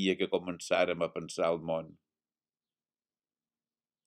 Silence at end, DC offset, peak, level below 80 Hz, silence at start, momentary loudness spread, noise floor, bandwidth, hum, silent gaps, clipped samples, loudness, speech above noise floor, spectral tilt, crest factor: 2.15 s; under 0.1%; -14 dBFS; -74 dBFS; 0 s; 7 LU; under -90 dBFS; 14 kHz; none; none; under 0.1%; -32 LUFS; over 58 dB; -4.5 dB/octave; 22 dB